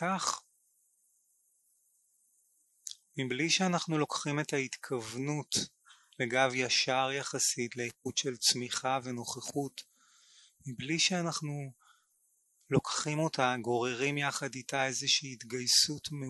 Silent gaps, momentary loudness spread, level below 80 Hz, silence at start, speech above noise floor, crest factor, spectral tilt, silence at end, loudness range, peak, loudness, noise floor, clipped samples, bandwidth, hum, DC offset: none; 13 LU; -72 dBFS; 0 s; 41 dB; 22 dB; -3 dB/octave; 0 s; 5 LU; -12 dBFS; -32 LUFS; -74 dBFS; under 0.1%; 12 kHz; none; under 0.1%